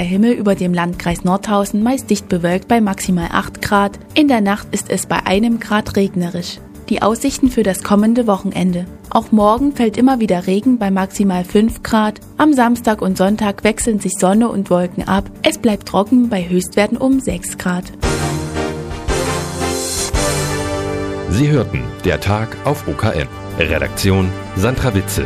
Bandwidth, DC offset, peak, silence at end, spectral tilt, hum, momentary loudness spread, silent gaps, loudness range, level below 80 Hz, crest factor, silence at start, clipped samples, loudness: 15.5 kHz; under 0.1%; 0 dBFS; 0 s; -5.5 dB/octave; none; 7 LU; none; 4 LU; -34 dBFS; 16 dB; 0 s; under 0.1%; -16 LUFS